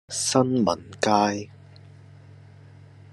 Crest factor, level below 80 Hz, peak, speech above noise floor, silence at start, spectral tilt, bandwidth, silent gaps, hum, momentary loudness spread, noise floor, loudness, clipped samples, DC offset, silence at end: 22 dB; -68 dBFS; -4 dBFS; 25 dB; 0.1 s; -4 dB/octave; 13 kHz; none; none; 10 LU; -48 dBFS; -23 LUFS; under 0.1%; under 0.1%; 1.7 s